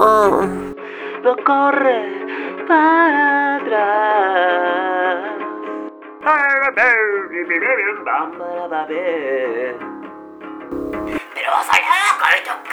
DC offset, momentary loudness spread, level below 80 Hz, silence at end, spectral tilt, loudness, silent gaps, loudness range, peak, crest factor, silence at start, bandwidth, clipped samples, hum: under 0.1%; 15 LU; -54 dBFS; 0 s; -3.5 dB/octave; -16 LUFS; none; 7 LU; 0 dBFS; 18 dB; 0 s; over 20 kHz; under 0.1%; none